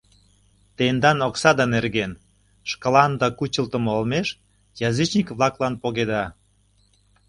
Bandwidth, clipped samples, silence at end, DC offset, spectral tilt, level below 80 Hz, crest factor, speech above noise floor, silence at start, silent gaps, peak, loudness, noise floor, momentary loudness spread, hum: 11.5 kHz; under 0.1%; 0.95 s; under 0.1%; -5 dB/octave; -52 dBFS; 22 dB; 40 dB; 0.8 s; none; 0 dBFS; -22 LUFS; -61 dBFS; 11 LU; 50 Hz at -50 dBFS